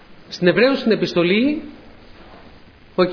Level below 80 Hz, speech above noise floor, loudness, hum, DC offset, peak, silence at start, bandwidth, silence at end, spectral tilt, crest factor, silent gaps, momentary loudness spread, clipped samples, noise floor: -50 dBFS; 28 dB; -18 LUFS; none; under 0.1%; -2 dBFS; 0.1 s; 5.4 kHz; 0 s; -6.5 dB/octave; 18 dB; none; 14 LU; under 0.1%; -45 dBFS